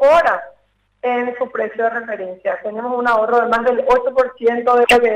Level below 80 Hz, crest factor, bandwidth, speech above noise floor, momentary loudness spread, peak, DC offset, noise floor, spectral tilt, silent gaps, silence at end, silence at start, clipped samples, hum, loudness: -48 dBFS; 10 dB; 15 kHz; 43 dB; 11 LU; -6 dBFS; under 0.1%; -59 dBFS; -3.5 dB/octave; none; 0 s; 0 s; under 0.1%; none; -17 LUFS